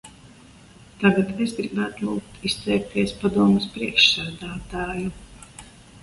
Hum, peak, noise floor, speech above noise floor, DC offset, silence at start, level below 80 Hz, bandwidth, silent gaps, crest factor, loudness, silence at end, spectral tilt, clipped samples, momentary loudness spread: none; -2 dBFS; -48 dBFS; 26 dB; under 0.1%; 0.05 s; -48 dBFS; 11.5 kHz; none; 22 dB; -22 LUFS; 0.05 s; -5 dB/octave; under 0.1%; 16 LU